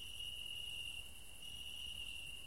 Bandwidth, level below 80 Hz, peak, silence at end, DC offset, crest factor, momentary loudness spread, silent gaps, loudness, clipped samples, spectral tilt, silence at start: 16 kHz; -62 dBFS; -36 dBFS; 0 s; 0.2%; 14 dB; 6 LU; none; -46 LUFS; under 0.1%; -0.5 dB/octave; 0 s